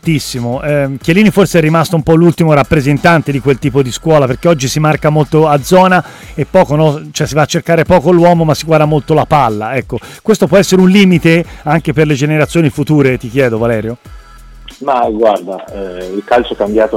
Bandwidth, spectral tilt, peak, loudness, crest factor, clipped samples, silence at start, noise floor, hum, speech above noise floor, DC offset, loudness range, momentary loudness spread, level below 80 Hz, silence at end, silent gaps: 16 kHz; -6 dB/octave; 0 dBFS; -10 LUFS; 10 dB; under 0.1%; 0.05 s; -34 dBFS; none; 24 dB; under 0.1%; 4 LU; 10 LU; -34 dBFS; 0 s; none